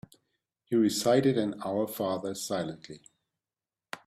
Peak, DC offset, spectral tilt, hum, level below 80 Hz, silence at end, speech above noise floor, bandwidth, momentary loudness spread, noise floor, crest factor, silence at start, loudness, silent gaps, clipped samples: -12 dBFS; under 0.1%; -5 dB/octave; none; -70 dBFS; 0.1 s; over 61 dB; 16 kHz; 17 LU; under -90 dBFS; 20 dB; 0.7 s; -29 LUFS; none; under 0.1%